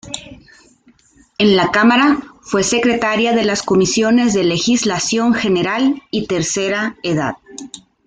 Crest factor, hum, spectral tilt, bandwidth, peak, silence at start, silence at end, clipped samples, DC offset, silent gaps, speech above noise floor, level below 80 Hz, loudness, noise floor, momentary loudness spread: 14 dB; none; -4 dB/octave; 9.6 kHz; -2 dBFS; 0.05 s; 0.3 s; under 0.1%; under 0.1%; none; 37 dB; -50 dBFS; -15 LUFS; -52 dBFS; 13 LU